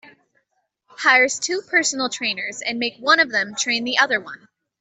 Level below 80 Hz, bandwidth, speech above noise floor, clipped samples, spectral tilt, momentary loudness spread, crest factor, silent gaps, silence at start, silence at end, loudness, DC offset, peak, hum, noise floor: -72 dBFS; 8.4 kHz; 51 dB; under 0.1%; -0.5 dB/octave; 9 LU; 20 dB; none; 1 s; 0.45 s; -19 LUFS; under 0.1%; -2 dBFS; none; -72 dBFS